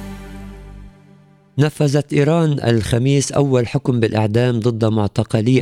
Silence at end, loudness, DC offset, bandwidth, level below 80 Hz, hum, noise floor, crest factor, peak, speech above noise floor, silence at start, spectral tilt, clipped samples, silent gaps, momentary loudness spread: 0 s; -17 LUFS; under 0.1%; 13.5 kHz; -42 dBFS; none; -48 dBFS; 14 dB; -2 dBFS; 32 dB; 0 s; -6.5 dB/octave; under 0.1%; none; 15 LU